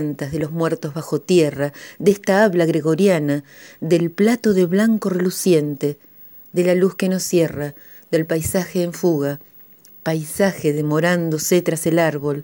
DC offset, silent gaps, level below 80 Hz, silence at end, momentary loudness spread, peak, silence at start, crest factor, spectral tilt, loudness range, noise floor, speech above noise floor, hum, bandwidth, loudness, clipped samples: under 0.1%; none; -54 dBFS; 0 s; 9 LU; -2 dBFS; 0 s; 18 dB; -5.5 dB/octave; 4 LU; -45 dBFS; 27 dB; none; over 20 kHz; -19 LUFS; under 0.1%